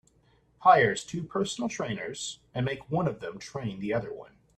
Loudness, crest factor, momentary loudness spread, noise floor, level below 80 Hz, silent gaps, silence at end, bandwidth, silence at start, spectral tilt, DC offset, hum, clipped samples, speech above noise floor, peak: -29 LUFS; 22 dB; 15 LU; -65 dBFS; -62 dBFS; none; 0.35 s; 11.5 kHz; 0.6 s; -5 dB/octave; under 0.1%; none; under 0.1%; 36 dB; -6 dBFS